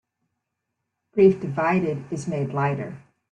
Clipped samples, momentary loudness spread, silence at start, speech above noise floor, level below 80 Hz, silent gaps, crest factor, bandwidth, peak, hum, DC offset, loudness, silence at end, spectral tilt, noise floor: under 0.1%; 12 LU; 1.15 s; 58 dB; -62 dBFS; none; 20 dB; 9 kHz; -6 dBFS; none; under 0.1%; -23 LUFS; 0.3 s; -8 dB/octave; -80 dBFS